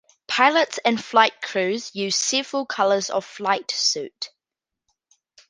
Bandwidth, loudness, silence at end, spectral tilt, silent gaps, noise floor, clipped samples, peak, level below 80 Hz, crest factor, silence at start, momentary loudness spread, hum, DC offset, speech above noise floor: 10.5 kHz; -21 LUFS; 1.25 s; -1.5 dB/octave; none; -87 dBFS; under 0.1%; -2 dBFS; -74 dBFS; 22 dB; 0.3 s; 9 LU; none; under 0.1%; 65 dB